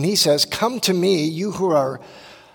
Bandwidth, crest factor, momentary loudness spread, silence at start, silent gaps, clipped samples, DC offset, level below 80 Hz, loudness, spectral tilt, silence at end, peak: 18 kHz; 16 dB; 8 LU; 0 s; none; under 0.1%; under 0.1%; -60 dBFS; -19 LUFS; -4 dB/octave; 0.2 s; -4 dBFS